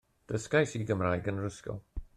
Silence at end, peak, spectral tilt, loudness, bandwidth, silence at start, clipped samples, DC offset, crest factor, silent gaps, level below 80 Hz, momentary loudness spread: 0.1 s; -14 dBFS; -6 dB/octave; -32 LUFS; 12.5 kHz; 0.3 s; under 0.1%; under 0.1%; 18 dB; none; -50 dBFS; 13 LU